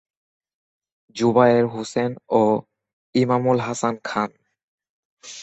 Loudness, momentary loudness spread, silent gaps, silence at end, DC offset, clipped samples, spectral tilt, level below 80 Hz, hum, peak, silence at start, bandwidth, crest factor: -21 LUFS; 10 LU; 2.93-3.13 s, 4.63-4.78 s, 4.89-5.17 s; 0 s; under 0.1%; under 0.1%; -6 dB/octave; -64 dBFS; none; -2 dBFS; 1.15 s; 8.4 kHz; 20 dB